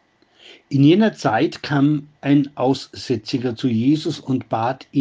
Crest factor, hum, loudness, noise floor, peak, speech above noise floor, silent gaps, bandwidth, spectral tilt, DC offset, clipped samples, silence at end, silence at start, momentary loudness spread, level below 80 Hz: 16 dB; none; -19 LUFS; -50 dBFS; -2 dBFS; 32 dB; none; 7.8 kHz; -7 dB/octave; under 0.1%; under 0.1%; 0 s; 0.5 s; 9 LU; -62 dBFS